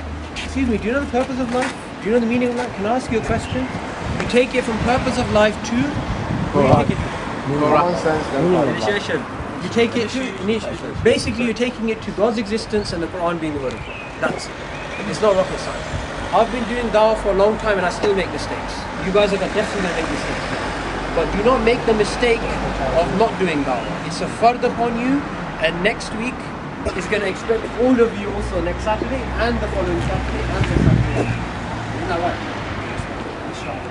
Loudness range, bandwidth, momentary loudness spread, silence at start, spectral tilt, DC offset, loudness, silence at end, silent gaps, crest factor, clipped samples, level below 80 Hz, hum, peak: 3 LU; 11 kHz; 9 LU; 0 s; -5.5 dB/octave; under 0.1%; -20 LUFS; 0 s; none; 20 dB; under 0.1%; -34 dBFS; none; 0 dBFS